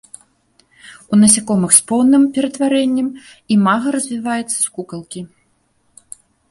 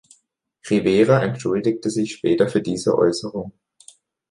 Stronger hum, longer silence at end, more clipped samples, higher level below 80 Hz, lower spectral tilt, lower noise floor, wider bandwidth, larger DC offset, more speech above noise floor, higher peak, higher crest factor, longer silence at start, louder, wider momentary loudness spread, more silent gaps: neither; first, 1.25 s vs 0.8 s; neither; about the same, -58 dBFS vs -56 dBFS; second, -4 dB/octave vs -6 dB/octave; second, -61 dBFS vs -66 dBFS; first, 16 kHz vs 11.5 kHz; neither; about the same, 46 dB vs 47 dB; about the same, 0 dBFS vs -2 dBFS; about the same, 16 dB vs 18 dB; first, 0.85 s vs 0.65 s; first, -14 LUFS vs -20 LUFS; first, 17 LU vs 14 LU; neither